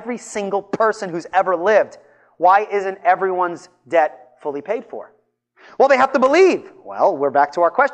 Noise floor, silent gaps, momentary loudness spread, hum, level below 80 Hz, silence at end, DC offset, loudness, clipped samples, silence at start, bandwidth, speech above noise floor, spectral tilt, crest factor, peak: -58 dBFS; none; 13 LU; none; -68 dBFS; 0 s; under 0.1%; -18 LUFS; under 0.1%; 0 s; 9.8 kHz; 40 dB; -4.5 dB/octave; 16 dB; -2 dBFS